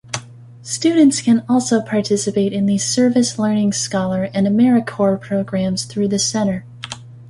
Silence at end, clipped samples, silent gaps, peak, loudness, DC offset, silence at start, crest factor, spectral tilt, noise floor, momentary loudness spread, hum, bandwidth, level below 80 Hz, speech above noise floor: 0 s; under 0.1%; none; -2 dBFS; -17 LUFS; under 0.1%; 0.1 s; 16 dB; -5 dB/octave; -37 dBFS; 13 LU; none; 11.5 kHz; -54 dBFS; 21 dB